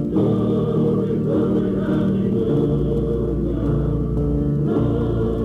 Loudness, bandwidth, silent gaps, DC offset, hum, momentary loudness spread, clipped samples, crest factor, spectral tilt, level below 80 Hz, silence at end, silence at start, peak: -20 LUFS; 5.2 kHz; none; under 0.1%; none; 3 LU; under 0.1%; 10 dB; -10.5 dB/octave; -30 dBFS; 0 s; 0 s; -8 dBFS